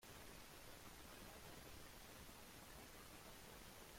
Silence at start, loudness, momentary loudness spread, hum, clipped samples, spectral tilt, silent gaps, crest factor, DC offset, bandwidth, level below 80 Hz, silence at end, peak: 0 s; -59 LUFS; 1 LU; none; under 0.1%; -3 dB/octave; none; 14 dB; under 0.1%; 16.5 kHz; -68 dBFS; 0 s; -44 dBFS